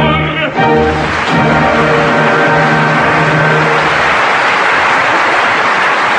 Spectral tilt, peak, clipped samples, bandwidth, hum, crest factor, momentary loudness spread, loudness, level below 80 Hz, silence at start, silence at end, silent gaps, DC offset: -5 dB/octave; 0 dBFS; under 0.1%; 10 kHz; none; 10 dB; 3 LU; -9 LUFS; -34 dBFS; 0 s; 0 s; none; under 0.1%